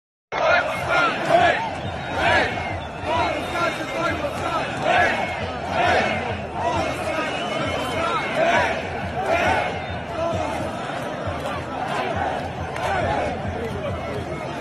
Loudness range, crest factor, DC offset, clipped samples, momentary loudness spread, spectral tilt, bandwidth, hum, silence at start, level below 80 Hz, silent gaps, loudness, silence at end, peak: 5 LU; 18 dB; under 0.1%; under 0.1%; 9 LU; -5 dB/octave; 13 kHz; none; 0.3 s; -44 dBFS; none; -23 LUFS; 0 s; -4 dBFS